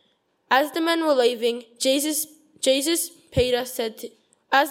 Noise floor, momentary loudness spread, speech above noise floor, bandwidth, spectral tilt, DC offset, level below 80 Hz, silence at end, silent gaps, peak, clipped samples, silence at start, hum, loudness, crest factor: -67 dBFS; 9 LU; 44 dB; 16.5 kHz; -2.5 dB/octave; under 0.1%; -48 dBFS; 0 s; none; -4 dBFS; under 0.1%; 0.5 s; none; -23 LUFS; 20 dB